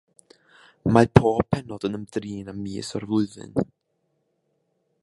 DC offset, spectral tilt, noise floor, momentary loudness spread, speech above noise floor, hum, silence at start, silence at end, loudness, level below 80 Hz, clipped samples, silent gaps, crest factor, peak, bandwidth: under 0.1%; -7.5 dB/octave; -73 dBFS; 15 LU; 50 dB; none; 0.85 s; 1.4 s; -24 LUFS; -46 dBFS; under 0.1%; none; 26 dB; 0 dBFS; 11.5 kHz